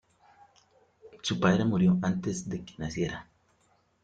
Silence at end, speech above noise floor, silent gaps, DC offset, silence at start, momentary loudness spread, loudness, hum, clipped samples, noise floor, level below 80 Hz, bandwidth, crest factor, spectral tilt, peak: 0.8 s; 41 dB; none; under 0.1%; 1.05 s; 12 LU; -29 LUFS; none; under 0.1%; -69 dBFS; -58 dBFS; 9 kHz; 20 dB; -6 dB/octave; -10 dBFS